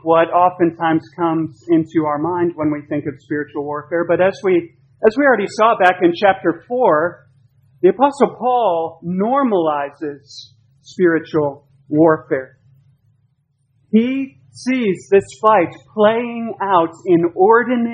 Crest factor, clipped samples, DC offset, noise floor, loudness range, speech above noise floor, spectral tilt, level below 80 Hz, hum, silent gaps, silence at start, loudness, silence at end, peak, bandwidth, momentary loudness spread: 16 dB; under 0.1%; under 0.1%; -63 dBFS; 4 LU; 47 dB; -7 dB/octave; -62 dBFS; none; none; 0.05 s; -16 LUFS; 0 s; 0 dBFS; 9.4 kHz; 11 LU